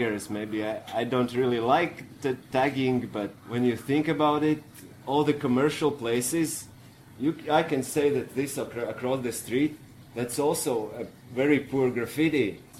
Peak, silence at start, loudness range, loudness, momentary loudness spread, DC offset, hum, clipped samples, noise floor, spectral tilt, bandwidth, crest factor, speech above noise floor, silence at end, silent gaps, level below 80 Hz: -10 dBFS; 0 s; 2 LU; -27 LUFS; 9 LU; under 0.1%; none; under 0.1%; -50 dBFS; -5 dB/octave; 16 kHz; 18 dB; 23 dB; 0 s; none; -62 dBFS